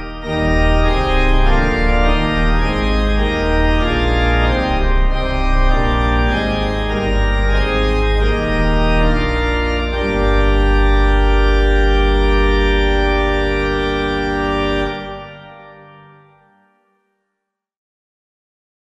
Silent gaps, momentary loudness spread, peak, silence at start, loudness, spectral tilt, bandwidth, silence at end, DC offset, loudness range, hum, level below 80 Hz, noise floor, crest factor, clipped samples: none; 4 LU; -2 dBFS; 0 s; -16 LUFS; -6.5 dB/octave; 8 kHz; 3.2 s; under 0.1%; 5 LU; 50 Hz at -30 dBFS; -18 dBFS; -77 dBFS; 12 dB; under 0.1%